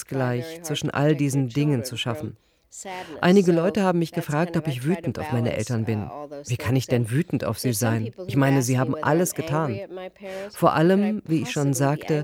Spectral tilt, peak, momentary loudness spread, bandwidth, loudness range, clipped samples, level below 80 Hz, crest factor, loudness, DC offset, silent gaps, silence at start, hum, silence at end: -6 dB/octave; -4 dBFS; 15 LU; 17 kHz; 3 LU; under 0.1%; -58 dBFS; 18 dB; -23 LUFS; under 0.1%; none; 0 s; none; 0 s